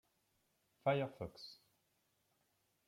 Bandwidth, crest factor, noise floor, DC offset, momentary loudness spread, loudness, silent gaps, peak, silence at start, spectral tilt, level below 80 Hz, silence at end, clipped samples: 16 kHz; 24 dB; -81 dBFS; under 0.1%; 17 LU; -41 LUFS; none; -22 dBFS; 0.85 s; -7 dB/octave; -78 dBFS; 1.35 s; under 0.1%